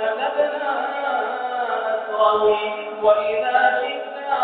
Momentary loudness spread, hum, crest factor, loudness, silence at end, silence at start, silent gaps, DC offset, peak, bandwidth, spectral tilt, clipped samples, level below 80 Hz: 7 LU; none; 16 dB; -21 LUFS; 0 s; 0 s; none; under 0.1%; -4 dBFS; 4.5 kHz; 0.5 dB/octave; under 0.1%; -64 dBFS